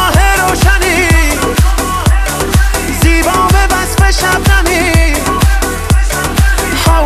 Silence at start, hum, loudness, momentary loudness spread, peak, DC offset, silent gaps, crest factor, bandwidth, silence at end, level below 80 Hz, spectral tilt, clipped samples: 0 s; none; -10 LUFS; 3 LU; 0 dBFS; under 0.1%; none; 10 dB; 14.5 kHz; 0 s; -12 dBFS; -4 dB/octave; under 0.1%